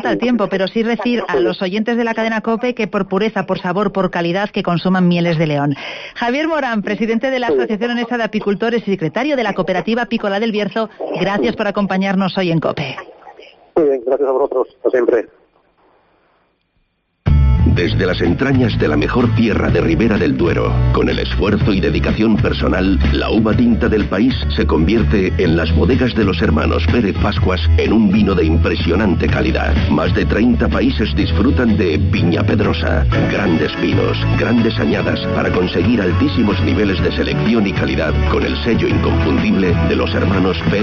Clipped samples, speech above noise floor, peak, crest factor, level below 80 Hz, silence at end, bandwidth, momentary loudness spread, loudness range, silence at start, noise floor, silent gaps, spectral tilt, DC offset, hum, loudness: under 0.1%; 49 dB; 0 dBFS; 14 dB; -26 dBFS; 0 s; 6.8 kHz; 4 LU; 4 LU; 0 s; -63 dBFS; none; -5.5 dB/octave; under 0.1%; none; -15 LUFS